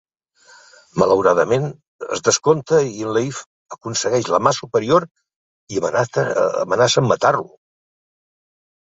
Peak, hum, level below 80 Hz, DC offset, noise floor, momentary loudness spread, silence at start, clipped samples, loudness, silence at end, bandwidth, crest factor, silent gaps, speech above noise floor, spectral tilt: -2 dBFS; none; -56 dBFS; under 0.1%; -52 dBFS; 13 LU; 0.95 s; under 0.1%; -18 LUFS; 1.4 s; 8 kHz; 18 dB; 1.87-1.99 s, 3.46-3.66 s, 5.11-5.15 s, 5.36-5.67 s; 35 dB; -4 dB/octave